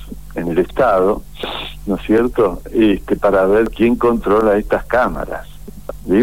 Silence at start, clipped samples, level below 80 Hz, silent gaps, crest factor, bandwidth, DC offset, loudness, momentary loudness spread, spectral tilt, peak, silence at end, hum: 0 s; under 0.1%; -34 dBFS; none; 14 dB; 16.5 kHz; 2%; -16 LUFS; 12 LU; -7 dB/octave; -2 dBFS; 0 s; none